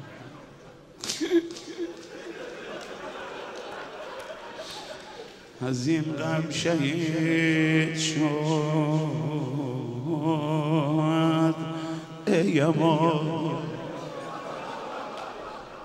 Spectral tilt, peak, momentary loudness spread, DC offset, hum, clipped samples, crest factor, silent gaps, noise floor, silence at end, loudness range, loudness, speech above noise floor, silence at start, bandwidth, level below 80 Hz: -5.5 dB/octave; -8 dBFS; 16 LU; under 0.1%; none; under 0.1%; 18 dB; none; -49 dBFS; 0 s; 13 LU; -27 LUFS; 24 dB; 0 s; 12.5 kHz; -64 dBFS